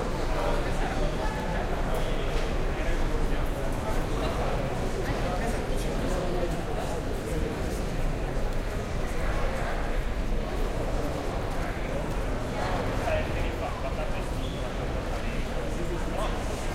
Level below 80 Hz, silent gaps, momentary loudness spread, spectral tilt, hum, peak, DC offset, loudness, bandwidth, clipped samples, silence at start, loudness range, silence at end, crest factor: -30 dBFS; none; 3 LU; -5.5 dB/octave; none; -14 dBFS; under 0.1%; -31 LUFS; 15.5 kHz; under 0.1%; 0 s; 2 LU; 0 s; 14 dB